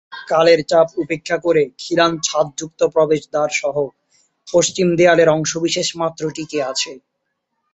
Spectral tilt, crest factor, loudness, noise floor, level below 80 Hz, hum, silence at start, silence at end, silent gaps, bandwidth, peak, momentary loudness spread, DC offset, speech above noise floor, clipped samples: -3.5 dB/octave; 16 dB; -17 LUFS; -73 dBFS; -58 dBFS; none; 0.1 s; 0.75 s; none; 8.2 kHz; -2 dBFS; 10 LU; under 0.1%; 56 dB; under 0.1%